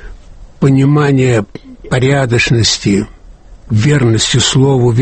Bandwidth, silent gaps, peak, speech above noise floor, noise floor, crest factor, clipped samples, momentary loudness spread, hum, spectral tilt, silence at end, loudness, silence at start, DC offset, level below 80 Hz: 8.8 kHz; none; 0 dBFS; 26 dB; -36 dBFS; 12 dB; under 0.1%; 7 LU; none; -5 dB/octave; 0 s; -11 LUFS; 0 s; under 0.1%; -34 dBFS